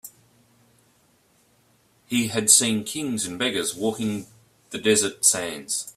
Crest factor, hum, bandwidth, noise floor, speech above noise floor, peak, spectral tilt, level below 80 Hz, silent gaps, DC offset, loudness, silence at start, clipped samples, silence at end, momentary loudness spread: 26 dB; none; 15.5 kHz; -62 dBFS; 39 dB; 0 dBFS; -2 dB/octave; -64 dBFS; none; under 0.1%; -21 LUFS; 0.05 s; under 0.1%; 0.05 s; 13 LU